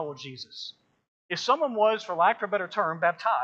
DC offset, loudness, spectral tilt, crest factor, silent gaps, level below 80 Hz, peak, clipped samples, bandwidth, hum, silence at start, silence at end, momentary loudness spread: under 0.1%; -26 LUFS; -4 dB/octave; 20 dB; 1.08-1.29 s; -86 dBFS; -8 dBFS; under 0.1%; 7.8 kHz; none; 0 s; 0 s; 15 LU